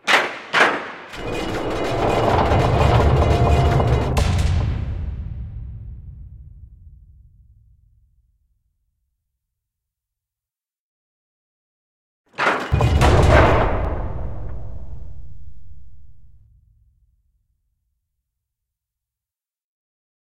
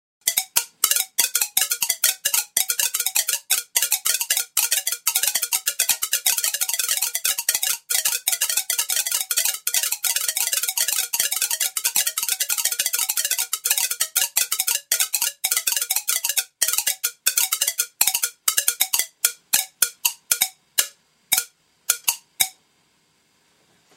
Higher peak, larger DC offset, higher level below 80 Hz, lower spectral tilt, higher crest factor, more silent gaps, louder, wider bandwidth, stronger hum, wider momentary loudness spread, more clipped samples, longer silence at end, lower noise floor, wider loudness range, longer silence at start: about the same, 0 dBFS vs 0 dBFS; neither; first, -28 dBFS vs -74 dBFS; first, -6 dB/octave vs 4 dB/octave; about the same, 22 dB vs 24 dB; first, 10.79-12.24 s vs none; about the same, -18 LUFS vs -20 LUFS; second, 13 kHz vs 16.5 kHz; neither; first, 22 LU vs 3 LU; neither; second, 0.6 s vs 1.45 s; first, under -90 dBFS vs -63 dBFS; first, 19 LU vs 2 LU; second, 0 s vs 0.25 s